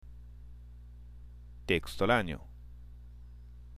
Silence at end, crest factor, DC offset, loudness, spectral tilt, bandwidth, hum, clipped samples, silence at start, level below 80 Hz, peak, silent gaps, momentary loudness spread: 0 s; 24 dB; under 0.1%; -31 LUFS; -5.5 dB/octave; 15.5 kHz; 60 Hz at -50 dBFS; under 0.1%; 0.05 s; -48 dBFS; -14 dBFS; none; 24 LU